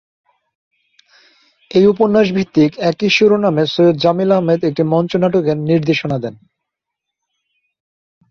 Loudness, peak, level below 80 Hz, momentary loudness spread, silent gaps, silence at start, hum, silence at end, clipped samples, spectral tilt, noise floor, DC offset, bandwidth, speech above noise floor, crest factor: -14 LUFS; -2 dBFS; -56 dBFS; 6 LU; none; 1.75 s; none; 1.95 s; under 0.1%; -7 dB/octave; -80 dBFS; under 0.1%; 7.2 kHz; 66 dB; 14 dB